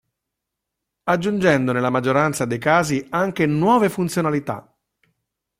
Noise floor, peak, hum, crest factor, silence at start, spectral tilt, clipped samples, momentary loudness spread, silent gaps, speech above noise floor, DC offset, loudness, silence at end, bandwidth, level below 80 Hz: -82 dBFS; -4 dBFS; none; 18 dB; 1.05 s; -6 dB/octave; under 0.1%; 6 LU; none; 63 dB; under 0.1%; -19 LUFS; 1 s; 16 kHz; -56 dBFS